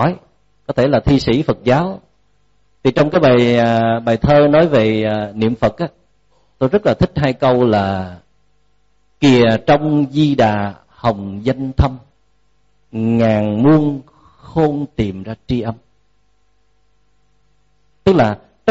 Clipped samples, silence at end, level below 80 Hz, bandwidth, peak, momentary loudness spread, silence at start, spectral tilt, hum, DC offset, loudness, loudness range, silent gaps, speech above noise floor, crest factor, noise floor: under 0.1%; 0 s; -36 dBFS; 8 kHz; -2 dBFS; 13 LU; 0 s; -6 dB/octave; 50 Hz at -45 dBFS; 0.2%; -15 LUFS; 8 LU; none; 48 dB; 14 dB; -62 dBFS